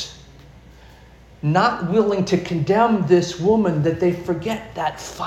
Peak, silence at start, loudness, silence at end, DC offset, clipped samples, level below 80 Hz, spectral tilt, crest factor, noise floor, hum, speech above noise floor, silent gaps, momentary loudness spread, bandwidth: -2 dBFS; 0 s; -20 LUFS; 0 s; under 0.1%; under 0.1%; -48 dBFS; -6.5 dB/octave; 18 dB; -46 dBFS; none; 27 dB; none; 9 LU; 13 kHz